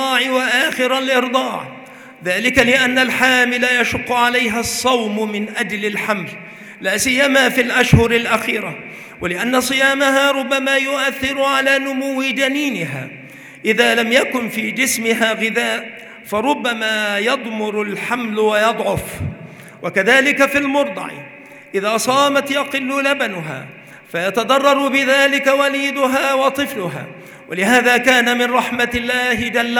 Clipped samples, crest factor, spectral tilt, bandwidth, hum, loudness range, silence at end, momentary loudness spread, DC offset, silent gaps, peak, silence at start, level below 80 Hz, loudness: under 0.1%; 16 dB; -3.5 dB/octave; over 20 kHz; none; 3 LU; 0 s; 15 LU; under 0.1%; none; 0 dBFS; 0 s; -44 dBFS; -16 LUFS